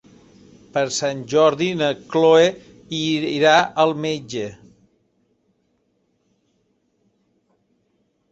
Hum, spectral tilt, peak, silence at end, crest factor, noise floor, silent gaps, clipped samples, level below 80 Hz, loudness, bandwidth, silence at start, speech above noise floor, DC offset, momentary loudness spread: none; -4 dB/octave; -2 dBFS; 3.75 s; 20 dB; -67 dBFS; none; under 0.1%; -62 dBFS; -19 LUFS; 8.2 kHz; 0.75 s; 49 dB; under 0.1%; 14 LU